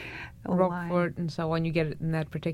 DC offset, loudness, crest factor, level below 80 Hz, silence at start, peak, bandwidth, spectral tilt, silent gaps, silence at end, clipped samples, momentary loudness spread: under 0.1%; -29 LUFS; 18 dB; -54 dBFS; 0 s; -12 dBFS; 11.5 kHz; -8 dB/octave; none; 0 s; under 0.1%; 5 LU